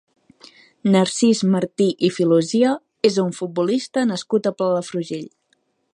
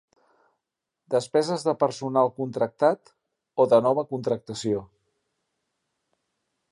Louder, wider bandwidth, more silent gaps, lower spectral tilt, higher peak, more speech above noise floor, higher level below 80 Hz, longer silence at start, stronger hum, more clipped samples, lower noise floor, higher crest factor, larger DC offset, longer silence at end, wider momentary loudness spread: first, -20 LUFS vs -25 LUFS; about the same, 11.5 kHz vs 11.5 kHz; neither; about the same, -5.5 dB/octave vs -6 dB/octave; first, -2 dBFS vs -6 dBFS; second, 48 dB vs 61 dB; about the same, -70 dBFS vs -68 dBFS; second, 0.85 s vs 1.1 s; neither; neither; second, -67 dBFS vs -85 dBFS; about the same, 18 dB vs 20 dB; neither; second, 0.65 s vs 1.85 s; about the same, 9 LU vs 9 LU